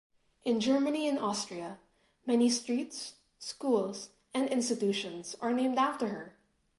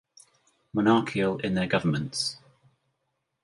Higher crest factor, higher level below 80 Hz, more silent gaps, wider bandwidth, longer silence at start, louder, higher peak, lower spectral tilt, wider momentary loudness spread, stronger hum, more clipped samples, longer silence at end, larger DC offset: second, 16 dB vs 22 dB; second, -76 dBFS vs -60 dBFS; neither; about the same, 11.5 kHz vs 11.5 kHz; second, 0.45 s vs 0.75 s; second, -32 LUFS vs -26 LUFS; second, -16 dBFS vs -8 dBFS; second, -4 dB/octave vs -5.5 dB/octave; first, 15 LU vs 9 LU; neither; neither; second, 0.5 s vs 1.05 s; neither